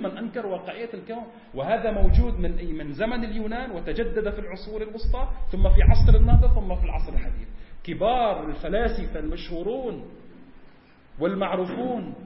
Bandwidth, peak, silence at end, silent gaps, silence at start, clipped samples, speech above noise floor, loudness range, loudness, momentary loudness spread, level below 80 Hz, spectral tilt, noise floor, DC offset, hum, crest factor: 5.8 kHz; -2 dBFS; 0 s; none; 0 s; under 0.1%; 29 dB; 7 LU; -26 LUFS; 16 LU; -24 dBFS; -11.5 dB/octave; -50 dBFS; under 0.1%; none; 20 dB